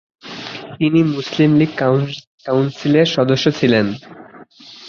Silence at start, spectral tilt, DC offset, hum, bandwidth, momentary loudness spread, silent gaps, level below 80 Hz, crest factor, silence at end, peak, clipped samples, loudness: 0.25 s; -6.5 dB/octave; under 0.1%; none; 7.2 kHz; 16 LU; 2.27-2.38 s; -54 dBFS; 16 dB; 0 s; -2 dBFS; under 0.1%; -16 LUFS